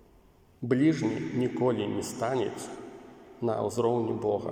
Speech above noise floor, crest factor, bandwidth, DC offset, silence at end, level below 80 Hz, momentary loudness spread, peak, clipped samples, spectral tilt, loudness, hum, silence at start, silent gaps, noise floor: 31 dB; 18 dB; 16.5 kHz; under 0.1%; 0 s; -66 dBFS; 15 LU; -12 dBFS; under 0.1%; -6.5 dB/octave; -29 LUFS; none; 0.6 s; none; -59 dBFS